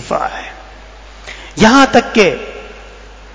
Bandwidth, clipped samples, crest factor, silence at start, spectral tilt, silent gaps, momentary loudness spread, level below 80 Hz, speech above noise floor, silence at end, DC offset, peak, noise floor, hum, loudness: 8 kHz; 0.4%; 14 dB; 0 s; -4 dB/octave; none; 23 LU; -38 dBFS; 24 dB; 0.5 s; under 0.1%; 0 dBFS; -35 dBFS; none; -11 LUFS